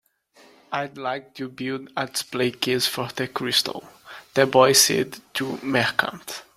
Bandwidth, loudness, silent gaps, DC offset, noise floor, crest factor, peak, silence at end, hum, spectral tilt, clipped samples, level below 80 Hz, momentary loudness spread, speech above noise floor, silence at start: 16 kHz; -22 LUFS; none; under 0.1%; -55 dBFS; 22 dB; -2 dBFS; 0.15 s; none; -2.5 dB/octave; under 0.1%; -64 dBFS; 15 LU; 32 dB; 0.7 s